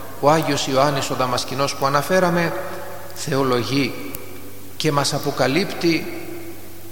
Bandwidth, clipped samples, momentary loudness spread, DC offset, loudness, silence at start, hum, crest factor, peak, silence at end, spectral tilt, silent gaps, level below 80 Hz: 17.5 kHz; under 0.1%; 16 LU; 3%; -20 LUFS; 0 s; none; 20 dB; -2 dBFS; 0 s; -4.5 dB/octave; none; -54 dBFS